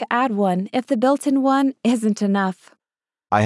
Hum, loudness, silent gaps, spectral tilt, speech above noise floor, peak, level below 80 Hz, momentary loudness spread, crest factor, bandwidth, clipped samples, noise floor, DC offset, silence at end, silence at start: none; -20 LUFS; none; -6 dB/octave; over 71 dB; -4 dBFS; -74 dBFS; 5 LU; 16 dB; 12 kHz; under 0.1%; under -90 dBFS; under 0.1%; 0 s; 0 s